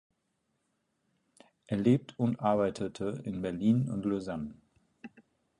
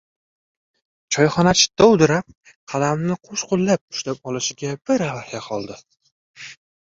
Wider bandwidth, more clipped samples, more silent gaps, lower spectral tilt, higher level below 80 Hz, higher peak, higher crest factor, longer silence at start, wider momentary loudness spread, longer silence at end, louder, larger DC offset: first, 10.5 kHz vs 7.8 kHz; neither; second, none vs 2.37-2.41 s, 2.56-2.67 s, 3.81-3.88 s, 6.12-6.34 s; first, -8 dB/octave vs -4 dB/octave; second, -64 dBFS vs -52 dBFS; second, -14 dBFS vs -2 dBFS; about the same, 20 dB vs 20 dB; first, 1.7 s vs 1.1 s; about the same, 15 LU vs 17 LU; first, 0.55 s vs 0.4 s; second, -31 LUFS vs -20 LUFS; neither